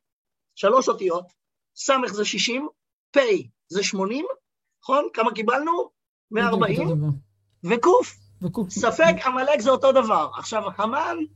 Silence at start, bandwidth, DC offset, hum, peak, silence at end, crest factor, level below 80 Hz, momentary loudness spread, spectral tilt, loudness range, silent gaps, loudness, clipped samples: 0.55 s; 8.6 kHz; under 0.1%; none; -4 dBFS; 0.1 s; 18 dB; -62 dBFS; 12 LU; -4.5 dB/octave; 4 LU; 2.93-3.13 s, 6.08-6.28 s; -22 LUFS; under 0.1%